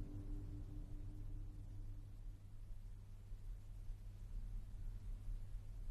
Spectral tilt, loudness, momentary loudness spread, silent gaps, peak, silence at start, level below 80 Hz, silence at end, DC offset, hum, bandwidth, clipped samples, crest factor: -7.5 dB/octave; -55 LUFS; 6 LU; none; -36 dBFS; 0 s; -50 dBFS; 0 s; under 0.1%; none; 11 kHz; under 0.1%; 12 dB